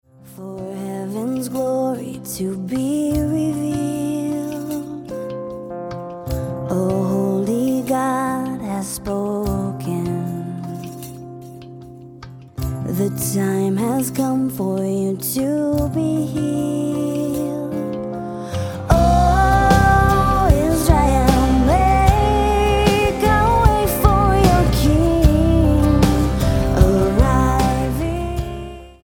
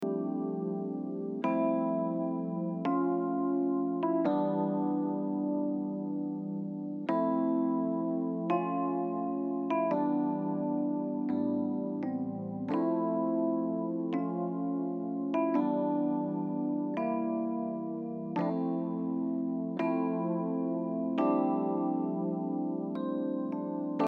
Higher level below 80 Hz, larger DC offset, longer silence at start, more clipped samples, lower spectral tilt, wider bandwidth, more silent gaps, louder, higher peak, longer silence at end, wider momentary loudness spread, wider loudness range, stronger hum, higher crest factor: first, -24 dBFS vs -84 dBFS; neither; first, 0.25 s vs 0 s; neither; second, -6.5 dB/octave vs -10.5 dB/octave; first, 17.5 kHz vs 4.7 kHz; neither; first, -18 LUFS vs -32 LUFS; first, 0 dBFS vs -16 dBFS; first, 0.15 s vs 0 s; first, 15 LU vs 6 LU; first, 10 LU vs 2 LU; neither; about the same, 18 dB vs 16 dB